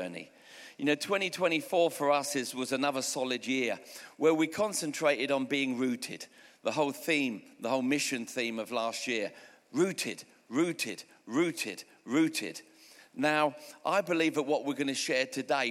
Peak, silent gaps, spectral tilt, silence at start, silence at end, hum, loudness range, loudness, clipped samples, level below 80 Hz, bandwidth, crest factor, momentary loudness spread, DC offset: -12 dBFS; none; -3.5 dB/octave; 0 s; 0 s; none; 3 LU; -31 LUFS; under 0.1%; -86 dBFS; 16.5 kHz; 20 dB; 12 LU; under 0.1%